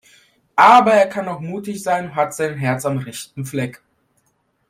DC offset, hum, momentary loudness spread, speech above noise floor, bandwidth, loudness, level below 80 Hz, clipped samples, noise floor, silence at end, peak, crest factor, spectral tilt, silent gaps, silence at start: under 0.1%; none; 17 LU; 49 dB; 16 kHz; -17 LUFS; -62 dBFS; under 0.1%; -66 dBFS; 0.95 s; 0 dBFS; 18 dB; -5 dB/octave; none; 0.55 s